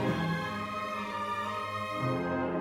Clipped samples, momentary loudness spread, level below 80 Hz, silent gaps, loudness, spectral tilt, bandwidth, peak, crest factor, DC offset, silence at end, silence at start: under 0.1%; 3 LU; -60 dBFS; none; -33 LUFS; -6.5 dB/octave; 17.5 kHz; -18 dBFS; 16 dB; under 0.1%; 0 s; 0 s